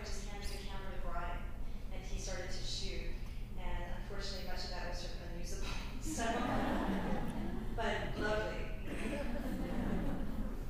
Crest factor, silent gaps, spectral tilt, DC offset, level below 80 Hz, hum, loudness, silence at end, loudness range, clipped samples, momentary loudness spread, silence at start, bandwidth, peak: 14 dB; none; -5 dB/octave; under 0.1%; -42 dBFS; none; -41 LUFS; 0 s; 6 LU; under 0.1%; 10 LU; 0 s; 15.5 kHz; -24 dBFS